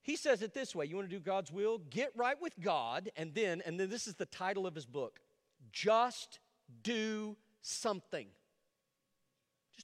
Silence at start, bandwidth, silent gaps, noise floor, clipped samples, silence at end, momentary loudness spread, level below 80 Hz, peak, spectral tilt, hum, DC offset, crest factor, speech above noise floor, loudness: 0.05 s; 14 kHz; none; -84 dBFS; under 0.1%; 0 s; 12 LU; -86 dBFS; -20 dBFS; -3.5 dB/octave; none; under 0.1%; 20 dB; 47 dB; -38 LUFS